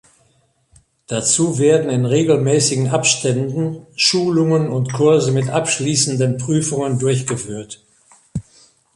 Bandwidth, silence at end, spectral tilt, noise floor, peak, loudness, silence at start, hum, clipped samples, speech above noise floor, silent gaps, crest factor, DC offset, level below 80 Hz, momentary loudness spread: 11.5 kHz; 0.55 s; -4.5 dB/octave; -60 dBFS; 0 dBFS; -16 LUFS; 1.1 s; none; under 0.1%; 43 dB; none; 18 dB; under 0.1%; -54 dBFS; 13 LU